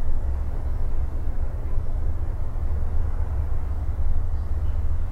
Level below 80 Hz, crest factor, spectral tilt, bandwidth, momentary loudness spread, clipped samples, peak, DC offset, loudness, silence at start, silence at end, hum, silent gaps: -24 dBFS; 12 dB; -9 dB/octave; 2.3 kHz; 3 LU; under 0.1%; -10 dBFS; under 0.1%; -30 LUFS; 0 s; 0 s; none; none